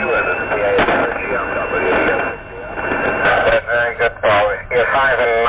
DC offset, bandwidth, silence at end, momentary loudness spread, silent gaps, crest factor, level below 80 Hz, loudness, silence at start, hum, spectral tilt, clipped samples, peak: under 0.1%; 4 kHz; 0 s; 6 LU; none; 10 dB; -38 dBFS; -16 LUFS; 0 s; none; -8 dB/octave; under 0.1%; -6 dBFS